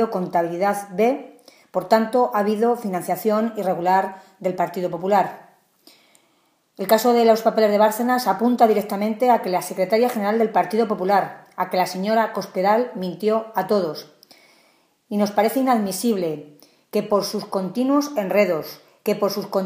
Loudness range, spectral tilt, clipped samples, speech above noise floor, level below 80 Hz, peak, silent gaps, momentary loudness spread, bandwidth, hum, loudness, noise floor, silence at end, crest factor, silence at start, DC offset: 5 LU; -5.5 dB/octave; under 0.1%; 44 dB; -74 dBFS; -2 dBFS; none; 10 LU; 15.5 kHz; none; -21 LUFS; -64 dBFS; 0 s; 18 dB; 0 s; under 0.1%